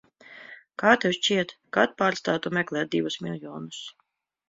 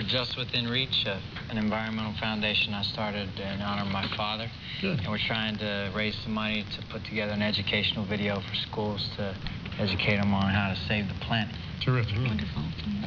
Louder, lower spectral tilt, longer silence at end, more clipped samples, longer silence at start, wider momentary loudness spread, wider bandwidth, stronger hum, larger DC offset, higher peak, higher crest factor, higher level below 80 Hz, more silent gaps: first, -25 LUFS vs -29 LUFS; second, -4 dB/octave vs -6.5 dB/octave; first, 0.6 s vs 0 s; neither; first, 0.3 s vs 0 s; first, 20 LU vs 8 LU; first, 7.8 kHz vs 5.4 kHz; neither; neither; first, -4 dBFS vs -12 dBFS; first, 24 dB vs 18 dB; second, -68 dBFS vs -48 dBFS; neither